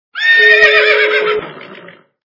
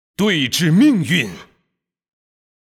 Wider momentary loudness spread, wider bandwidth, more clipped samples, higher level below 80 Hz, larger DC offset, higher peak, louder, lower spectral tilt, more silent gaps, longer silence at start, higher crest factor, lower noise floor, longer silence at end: first, 14 LU vs 6 LU; second, 6 kHz vs 16.5 kHz; first, 0.4% vs under 0.1%; about the same, -56 dBFS vs -56 dBFS; neither; first, 0 dBFS vs -4 dBFS; first, -8 LUFS vs -16 LUFS; second, -2 dB/octave vs -5 dB/octave; neither; about the same, 0.15 s vs 0.2 s; about the same, 12 dB vs 14 dB; second, -38 dBFS vs -73 dBFS; second, 0.55 s vs 1.15 s